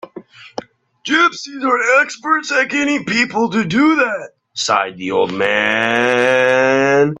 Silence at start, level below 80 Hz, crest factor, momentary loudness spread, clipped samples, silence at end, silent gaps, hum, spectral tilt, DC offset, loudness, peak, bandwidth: 0.15 s; -60 dBFS; 16 dB; 15 LU; under 0.1%; 0.05 s; none; none; -4 dB/octave; under 0.1%; -15 LUFS; 0 dBFS; 10.5 kHz